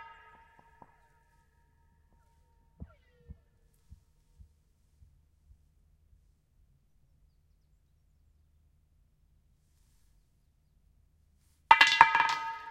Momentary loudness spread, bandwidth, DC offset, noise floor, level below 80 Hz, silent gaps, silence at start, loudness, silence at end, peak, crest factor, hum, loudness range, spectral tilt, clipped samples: 11 LU; 16 kHz; under 0.1%; -69 dBFS; -64 dBFS; none; 0 s; -23 LUFS; 0 s; 0 dBFS; 34 dB; none; 3 LU; -0.5 dB/octave; under 0.1%